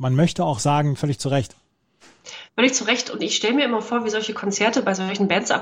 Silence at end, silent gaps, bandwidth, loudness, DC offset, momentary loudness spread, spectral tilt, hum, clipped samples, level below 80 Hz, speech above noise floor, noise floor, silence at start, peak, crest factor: 0 s; none; 14.5 kHz; -21 LUFS; under 0.1%; 6 LU; -4.5 dB/octave; none; under 0.1%; -56 dBFS; 35 dB; -56 dBFS; 0 s; -2 dBFS; 18 dB